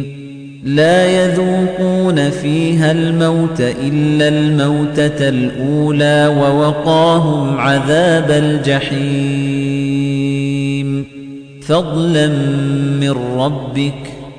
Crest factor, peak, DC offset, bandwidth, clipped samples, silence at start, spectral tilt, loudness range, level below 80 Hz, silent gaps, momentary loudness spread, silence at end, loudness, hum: 12 dB; -2 dBFS; under 0.1%; 10 kHz; under 0.1%; 0 s; -6.5 dB/octave; 4 LU; -44 dBFS; none; 7 LU; 0 s; -14 LUFS; none